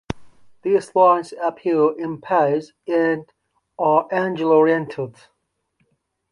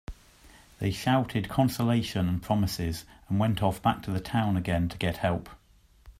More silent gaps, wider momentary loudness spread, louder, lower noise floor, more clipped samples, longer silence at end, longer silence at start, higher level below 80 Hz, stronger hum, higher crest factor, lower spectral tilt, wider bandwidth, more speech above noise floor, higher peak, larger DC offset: neither; first, 14 LU vs 7 LU; first, -19 LUFS vs -28 LUFS; first, -69 dBFS vs -60 dBFS; neither; first, 1.2 s vs 0.1 s; about the same, 0.1 s vs 0.1 s; second, -56 dBFS vs -48 dBFS; neither; about the same, 18 dB vs 18 dB; about the same, -7 dB/octave vs -6.5 dB/octave; second, 11 kHz vs 16 kHz; first, 51 dB vs 32 dB; first, -4 dBFS vs -10 dBFS; neither